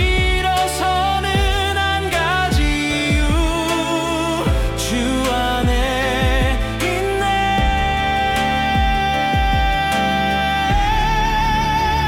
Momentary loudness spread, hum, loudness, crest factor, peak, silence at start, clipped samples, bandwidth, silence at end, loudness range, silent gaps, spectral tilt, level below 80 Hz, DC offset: 2 LU; none; -18 LUFS; 12 dB; -6 dBFS; 0 s; under 0.1%; 17.5 kHz; 0 s; 1 LU; none; -4.5 dB/octave; -24 dBFS; under 0.1%